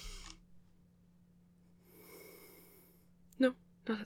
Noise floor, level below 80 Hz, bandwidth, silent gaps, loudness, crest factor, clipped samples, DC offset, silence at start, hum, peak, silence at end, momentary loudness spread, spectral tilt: -66 dBFS; -60 dBFS; 17.5 kHz; none; -37 LUFS; 26 dB; under 0.1%; under 0.1%; 0 s; none; -16 dBFS; 0 s; 27 LU; -5 dB/octave